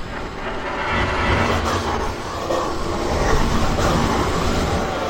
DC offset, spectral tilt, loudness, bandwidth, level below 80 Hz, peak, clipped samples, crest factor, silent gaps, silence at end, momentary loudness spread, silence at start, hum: under 0.1%; -5 dB/octave; -21 LUFS; 16.5 kHz; -28 dBFS; -4 dBFS; under 0.1%; 16 dB; none; 0 s; 7 LU; 0 s; none